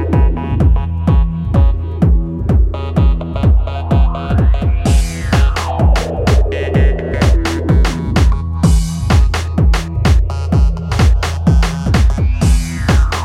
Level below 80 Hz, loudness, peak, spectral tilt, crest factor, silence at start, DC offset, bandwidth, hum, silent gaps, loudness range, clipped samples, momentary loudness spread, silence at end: -14 dBFS; -14 LUFS; 0 dBFS; -6.5 dB/octave; 12 dB; 0 s; under 0.1%; 12.5 kHz; none; none; 1 LU; under 0.1%; 2 LU; 0 s